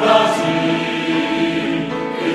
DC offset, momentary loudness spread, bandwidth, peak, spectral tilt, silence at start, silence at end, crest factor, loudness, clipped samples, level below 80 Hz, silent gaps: under 0.1%; 7 LU; 13 kHz; 0 dBFS; -5 dB/octave; 0 s; 0 s; 16 dB; -18 LUFS; under 0.1%; -54 dBFS; none